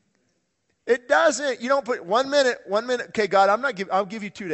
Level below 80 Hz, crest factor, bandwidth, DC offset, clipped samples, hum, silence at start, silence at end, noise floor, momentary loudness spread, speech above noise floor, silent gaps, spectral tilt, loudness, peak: -68 dBFS; 18 dB; 8.4 kHz; under 0.1%; under 0.1%; none; 0.85 s; 0 s; -72 dBFS; 8 LU; 50 dB; none; -3 dB/octave; -22 LUFS; -6 dBFS